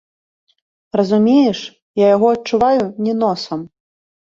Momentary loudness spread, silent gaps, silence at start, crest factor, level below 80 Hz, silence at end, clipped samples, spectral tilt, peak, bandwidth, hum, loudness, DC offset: 13 LU; 1.82-1.94 s; 0.95 s; 16 dB; -56 dBFS; 0.65 s; under 0.1%; -6.5 dB/octave; -2 dBFS; 7.6 kHz; none; -16 LUFS; under 0.1%